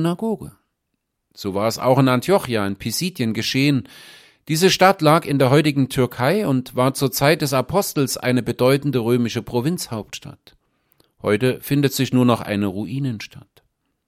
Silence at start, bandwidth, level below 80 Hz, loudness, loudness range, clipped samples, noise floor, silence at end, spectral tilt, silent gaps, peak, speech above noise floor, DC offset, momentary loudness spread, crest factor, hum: 0 s; 16.5 kHz; -54 dBFS; -19 LUFS; 5 LU; under 0.1%; -76 dBFS; 0.7 s; -5.5 dB/octave; none; -2 dBFS; 57 dB; under 0.1%; 11 LU; 18 dB; none